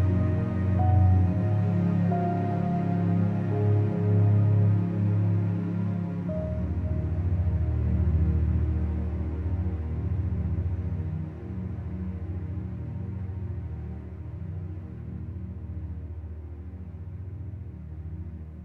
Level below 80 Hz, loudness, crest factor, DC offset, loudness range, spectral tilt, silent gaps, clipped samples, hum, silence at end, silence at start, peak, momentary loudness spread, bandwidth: -36 dBFS; -28 LUFS; 14 dB; under 0.1%; 13 LU; -11.5 dB/octave; none; under 0.1%; none; 0 s; 0 s; -12 dBFS; 15 LU; 3.3 kHz